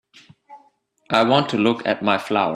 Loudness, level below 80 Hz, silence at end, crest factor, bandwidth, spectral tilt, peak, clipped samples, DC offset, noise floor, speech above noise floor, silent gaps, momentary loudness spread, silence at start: -19 LUFS; -64 dBFS; 0 s; 20 dB; 13 kHz; -6 dB/octave; -2 dBFS; under 0.1%; under 0.1%; -60 dBFS; 41 dB; none; 4 LU; 0.5 s